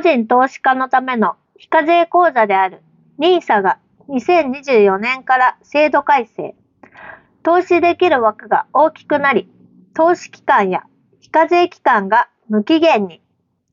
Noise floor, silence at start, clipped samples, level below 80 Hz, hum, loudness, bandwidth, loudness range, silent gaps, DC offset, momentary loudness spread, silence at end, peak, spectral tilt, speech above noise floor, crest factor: -65 dBFS; 0 s; under 0.1%; -66 dBFS; none; -15 LUFS; 7.4 kHz; 1 LU; none; under 0.1%; 7 LU; 0.6 s; -2 dBFS; -2.5 dB/octave; 51 dB; 12 dB